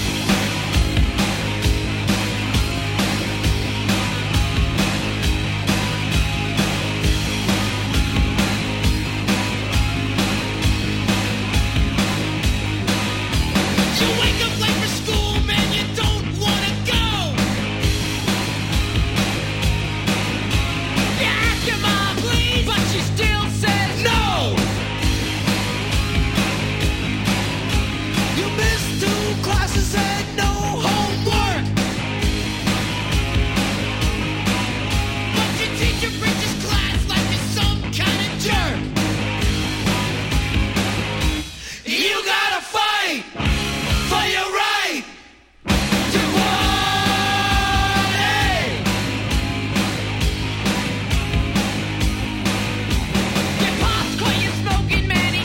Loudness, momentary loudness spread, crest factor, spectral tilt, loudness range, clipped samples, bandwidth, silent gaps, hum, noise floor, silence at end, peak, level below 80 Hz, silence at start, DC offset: -20 LUFS; 4 LU; 16 dB; -4 dB/octave; 2 LU; under 0.1%; 16.5 kHz; none; none; -46 dBFS; 0 s; -4 dBFS; -28 dBFS; 0 s; under 0.1%